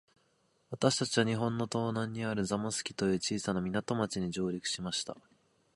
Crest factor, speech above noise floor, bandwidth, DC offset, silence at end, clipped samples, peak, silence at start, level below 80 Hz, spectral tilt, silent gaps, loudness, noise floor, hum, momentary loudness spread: 24 dB; 40 dB; 11.5 kHz; under 0.1%; 0.55 s; under 0.1%; -10 dBFS; 0.7 s; -64 dBFS; -4.5 dB/octave; none; -33 LUFS; -73 dBFS; none; 6 LU